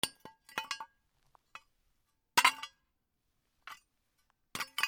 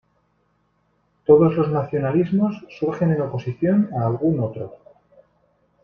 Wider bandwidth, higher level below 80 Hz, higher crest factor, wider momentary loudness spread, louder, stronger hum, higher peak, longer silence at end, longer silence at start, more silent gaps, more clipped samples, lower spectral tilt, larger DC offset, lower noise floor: first, over 20 kHz vs 6.2 kHz; second, -78 dBFS vs -56 dBFS; first, 30 dB vs 20 dB; first, 28 LU vs 12 LU; second, -33 LUFS vs -20 LUFS; neither; second, -8 dBFS vs -2 dBFS; second, 0 s vs 1.1 s; second, 0.05 s vs 1.3 s; neither; neither; second, 0.5 dB/octave vs -10.5 dB/octave; neither; first, -81 dBFS vs -66 dBFS